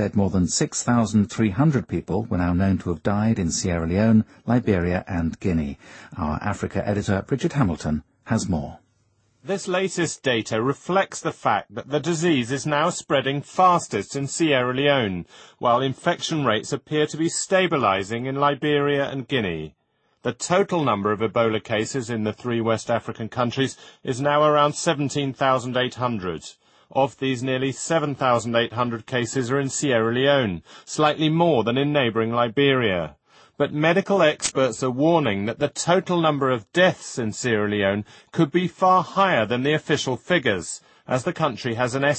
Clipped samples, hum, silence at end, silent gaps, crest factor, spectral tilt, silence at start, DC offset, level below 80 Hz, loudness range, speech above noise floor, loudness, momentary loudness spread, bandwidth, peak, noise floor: under 0.1%; none; 0 s; none; 18 dB; -5 dB/octave; 0 s; under 0.1%; -48 dBFS; 4 LU; 43 dB; -22 LUFS; 9 LU; 8.8 kHz; -4 dBFS; -65 dBFS